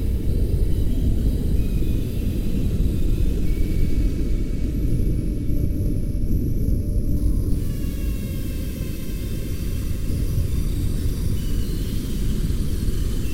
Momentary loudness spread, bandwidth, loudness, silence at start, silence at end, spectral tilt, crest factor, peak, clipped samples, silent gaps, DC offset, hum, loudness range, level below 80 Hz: 5 LU; 16 kHz; -25 LUFS; 0 s; 0 s; -7 dB/octave; 14 dB; -6 dBFS; under 0.1%; none; under 0.1%; none; 3 LU; -22 dBFS